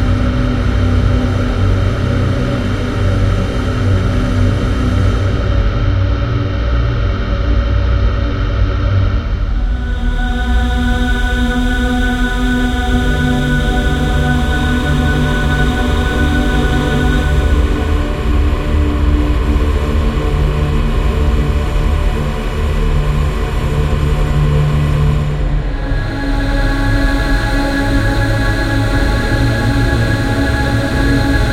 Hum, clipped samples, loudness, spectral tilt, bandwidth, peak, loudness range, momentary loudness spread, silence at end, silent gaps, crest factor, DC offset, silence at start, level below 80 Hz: none; under 0.1%; -15 LUFS; -6.5 dB/octave; 13.5 kHz; 0 dBFS; 2 LU; 3 LU; 0 s; none; 12 dB; 1%; 0 s; -16 dBFS